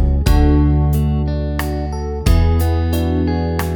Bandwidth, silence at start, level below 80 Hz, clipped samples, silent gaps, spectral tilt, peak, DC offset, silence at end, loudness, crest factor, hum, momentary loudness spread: 20 kHz; 0 s; -18 dBFS; under 0.1%; none; -7.5 dB/octave; 0 dBFS; under 0.1%; 0 s; -17 LUFS; 14 dB; none; 7 LU